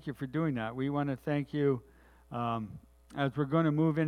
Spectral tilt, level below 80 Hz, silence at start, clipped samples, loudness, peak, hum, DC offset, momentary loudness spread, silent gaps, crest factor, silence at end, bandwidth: -9 dB/octave; -62 dBFS; 0.05 s; under 0.1%; -33 LUFS; -16 dBFS; none; under 0.1%; 13 LU; none; 18 dB; 0 s; 11 kHz